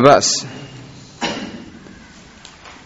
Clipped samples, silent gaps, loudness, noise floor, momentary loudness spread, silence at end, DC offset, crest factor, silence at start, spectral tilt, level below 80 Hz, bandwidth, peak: under 0.1%; none; -17 LUFS; -42 dBFS; 26 LU; 0.15 s; under 0.1%; 20 dB; 0 s; -3.5 dB/octave; -52 dBFS; 8.2 kHz; 0 dBFS